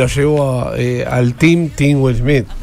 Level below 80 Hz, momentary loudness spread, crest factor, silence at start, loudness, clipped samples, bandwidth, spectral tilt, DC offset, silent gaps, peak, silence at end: -28 dBFS; 5 LU; 12 dB; 0 s; -14 LUFS; under 0.1%; 14.5 kHz; -7 dB/octave; under 0.1%; none; 0 dBFS; 0 s